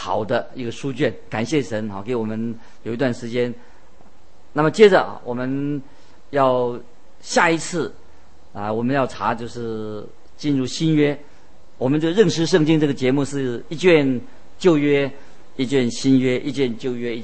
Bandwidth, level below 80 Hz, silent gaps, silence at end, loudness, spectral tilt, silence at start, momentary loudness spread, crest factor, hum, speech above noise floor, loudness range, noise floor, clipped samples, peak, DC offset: 8.8 kHz; -56 dBFS; none; 0 s; -20 LUFS; -5.5 dB/octave; 0 s; 12 LU; 20 dB; none; 32 dB; 6 LU; -52 dBFS; under 0.1%; -2 dBFS; 2%